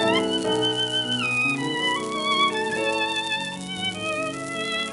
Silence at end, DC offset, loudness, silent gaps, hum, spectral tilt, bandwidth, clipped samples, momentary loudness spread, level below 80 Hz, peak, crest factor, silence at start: 0 s; under 0.1%; -23 LUFS; none; none; -3 dB/octave; 12 kHz; under 0.1%; 7 LU; -60 dBFS; -8 dBFS; 16 dB; 0 s